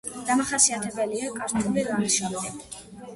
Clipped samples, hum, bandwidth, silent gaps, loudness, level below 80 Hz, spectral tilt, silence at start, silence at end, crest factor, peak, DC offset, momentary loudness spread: under 0.1%; none; 11.5 kHz; none; -24 LUFS; -58 dBFS; -2.5 dB/octave; 0.05 s; 0 s; 20 dB; -6 dBFS; under 0.1%; 16 LU